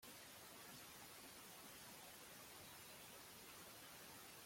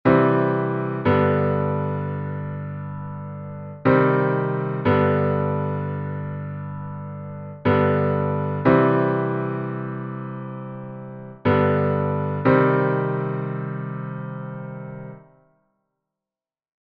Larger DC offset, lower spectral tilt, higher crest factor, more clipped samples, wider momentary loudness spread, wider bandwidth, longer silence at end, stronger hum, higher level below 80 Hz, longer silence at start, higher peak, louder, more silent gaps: neither; second, -1.5 dB/octave vs -7.5 dB/octave; about the same, 14 dB vs 18 dB; neither; second, 1 LU vs 16 LU; first, 16.5 kHz vs 5 kHz; second, 0 s vs 1.65 s; neither; second, -84 dBFS vs -54 dBFS; about the same, 0 s vs 0.05 s; second, -46 dBFS vs -4 dBFS; second, -58 LUFS vs -22 LUFS; neither